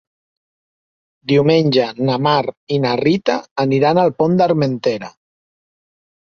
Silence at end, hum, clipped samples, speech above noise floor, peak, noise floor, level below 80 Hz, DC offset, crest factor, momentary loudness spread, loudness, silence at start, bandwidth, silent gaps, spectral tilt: 1.2 s; none; under 0.1%; over 75 dB; -2 dBFS; under -90 dBFS; -58 dBFS; under 0.1%; 16 dB; 8 LU; -16 LUFS; 1.3 s; 7 kHz; 2.57-2.67 s, 3.51-3.56 s; -7 dB/octave